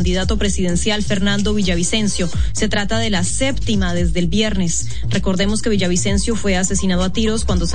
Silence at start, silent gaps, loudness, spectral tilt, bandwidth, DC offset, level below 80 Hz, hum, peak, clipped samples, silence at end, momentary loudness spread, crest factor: 0 s; none; -18 LUFS; -4.5 dB/octave; 10.5 kHz; 9%; -26 dBFS; none; -4 dBFS; under 0.1%; 0 s; 2 LU; 14 dB